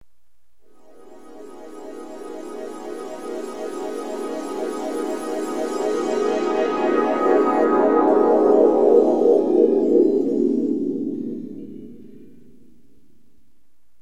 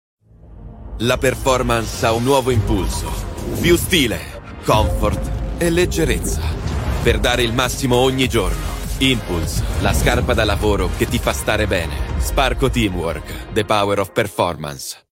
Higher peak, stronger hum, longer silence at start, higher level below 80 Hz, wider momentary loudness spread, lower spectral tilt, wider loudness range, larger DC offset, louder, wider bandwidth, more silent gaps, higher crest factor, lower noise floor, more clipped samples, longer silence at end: about the same, -2 dBFS vs 0 dBFS; neither; first, 1.1 s vs 0.45 s; second, -64 dBFS vs -26 dBFS; first, 20 LU vs 9 LU; first, -6 dB/octave vs -4.5 dB/octave; first, 17 LU vs 2 LU; first, 0.8% vs under 0.1%; about the same, -20 LUFS vs -18 LUFS; second, 13 kHz vs 16.5 kHz; neither; about the same, 18 dB vs 18 dB; first, -71 dBFS vs -39 dBFS; neither; first, 1.95 s vs 0.15 s